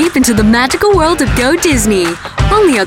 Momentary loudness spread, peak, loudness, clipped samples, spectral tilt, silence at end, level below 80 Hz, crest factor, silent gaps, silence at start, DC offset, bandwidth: 4 LU; 0 dBFS; -10 LUFS; under 0.1%; -4.5 dB/octave; 0 s; -22 dBFS; 8 dB; none; 0 s; under 0.1%; 17 kHz